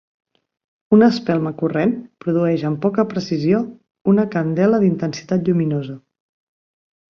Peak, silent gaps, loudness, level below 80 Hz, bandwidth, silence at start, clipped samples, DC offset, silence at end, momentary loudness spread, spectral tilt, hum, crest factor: -2 dBFS; 4.01-4.05 s; -18 LUFS; -60 dBFS; 6.8 kHz; 0.9 s; under 0.1%; under 0.1%; 1.15 s; 10 LU; -8 dB/octave; none; 16 dB